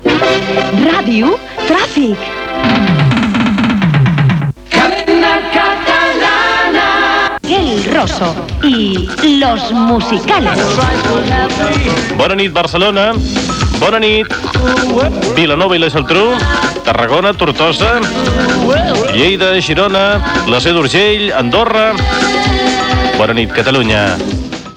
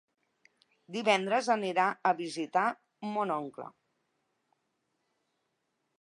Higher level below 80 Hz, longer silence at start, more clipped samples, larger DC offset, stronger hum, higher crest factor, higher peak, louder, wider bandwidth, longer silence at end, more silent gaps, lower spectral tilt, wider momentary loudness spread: first, -26 dBFS vs -88 dBFS; second, 0 s vs 0.9 s; neither; neither; neither; second, 10 dB vs 22 dB; first, 0 dBFS vs -12 dBFS; first, -11 LUFS vs -30 LUFS; about the same, 12 kHz vs 11.5 kHz; second, 0 s vs 2.3 s; neither; about the same, -5 dB/octave vs -4 dB/octave; second, 4 LU vs 14 LU